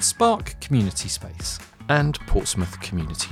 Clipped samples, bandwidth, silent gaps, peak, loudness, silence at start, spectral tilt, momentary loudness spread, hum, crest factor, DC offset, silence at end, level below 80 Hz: under 0.1%; 16 kHz; none; -4 dBFS; -24 LUFS; 0 s; -4 dB/octave; 10 LU; none; 18 dB; under 0.1%; 0 s; -32 dBFS